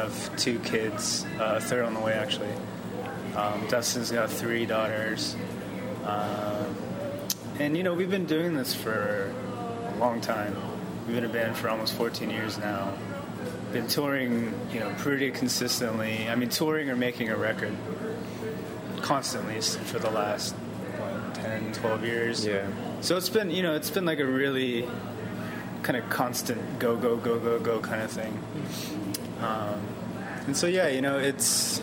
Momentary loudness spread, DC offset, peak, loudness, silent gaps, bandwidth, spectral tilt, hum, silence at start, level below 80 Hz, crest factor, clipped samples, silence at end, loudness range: 9 LU; under 0.1%; -8 dBFS; -29 LUFS; none; 17 kHz; -4 dB/octave; none; 0 s; -62 dBFS; 20 dB; under 0.1%; 0 s; 3 LU